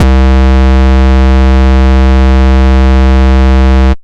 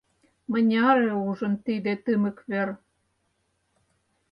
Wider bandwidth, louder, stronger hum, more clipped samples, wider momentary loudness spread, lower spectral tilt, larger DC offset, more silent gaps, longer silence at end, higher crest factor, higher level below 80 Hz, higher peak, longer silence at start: first, 6.8 kHz vs 5.4 kHz; first, -7 LUFS vs -25 LUFS; neither; neither; second, 0 LU vs 10 LU; about the same, -8 dB/octave vs -8.5 dB/octave; neither; neither; second, 0.05 s vs 1.55 s; second, 4 dB vs 18 dB; first, -6 dBFS vs -70 dBFS; first, 0 dBFS vs -10 dBFS; second, 0 s vs 0.5 s